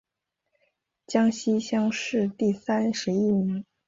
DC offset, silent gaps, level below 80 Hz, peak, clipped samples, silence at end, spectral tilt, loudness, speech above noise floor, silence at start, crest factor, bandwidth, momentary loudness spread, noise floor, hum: under 0.1%; none; -66 dBFS; -10 dBFS; under 0.1%; 0.25 s; -5.5 dB/octave; -26 LUFS; 58 dB; 1.1 s; 18 dB; 7.8 kHz; 4 LU; -82 dBFS; none